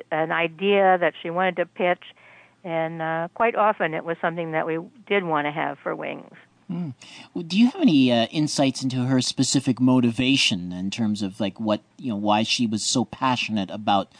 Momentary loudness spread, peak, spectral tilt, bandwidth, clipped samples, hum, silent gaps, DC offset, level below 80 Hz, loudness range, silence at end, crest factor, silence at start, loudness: 12 LU; -8 dBFS; -4.5 dB/octave; 10 kHz; under 0.1%; none; none; under 0.1%; -64 dBFS; 5 LU; 0.15 s; 14 dB; 0.1 s; -23 LUFS